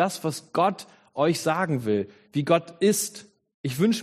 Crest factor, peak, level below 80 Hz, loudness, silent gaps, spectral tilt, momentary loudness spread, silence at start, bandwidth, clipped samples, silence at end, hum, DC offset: 18 dB; -8 dBFS; -68 dBFS; -25 LUFS; 3.54-3.64 s; -5 dB/octave; 11 LU; 0 s; 15 kHz; under 0.1%; 0 s; none; under 0.1%